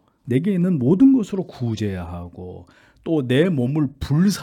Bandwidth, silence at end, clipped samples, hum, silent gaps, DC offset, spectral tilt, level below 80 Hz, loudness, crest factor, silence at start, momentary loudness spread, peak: 14.5 kHz; 0 s; under 0.1%; none; none; under 0.1%; -7.5 dB/octave; -48 dBFS; -20 LUFS; 14 dB; 0.25 s; 19 LU; -6 dBFS